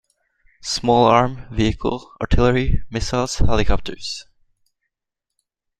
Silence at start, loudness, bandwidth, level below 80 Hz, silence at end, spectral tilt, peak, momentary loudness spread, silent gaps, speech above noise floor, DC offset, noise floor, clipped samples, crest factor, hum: 0.65 s; -20 LUFS; 9.8 kHz; -28 dBFS; 1.6 s; -5.5 dB/octave; -2 dBFS; 13 LU; none; 65 dB; under 0.1%; -82 dBFS; under 0.1%; 18 dB; none